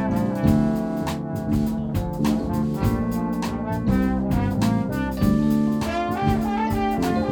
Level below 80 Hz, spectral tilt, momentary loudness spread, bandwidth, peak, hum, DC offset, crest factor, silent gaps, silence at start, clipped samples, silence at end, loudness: -36 dBFS; -7.5 dB/octave; 6 LU; 19.5 kHz; -4 dBFS; none; under 0.1%; 18 dB; none; 0 s; under 0.1%; 0 s; -23 LUFS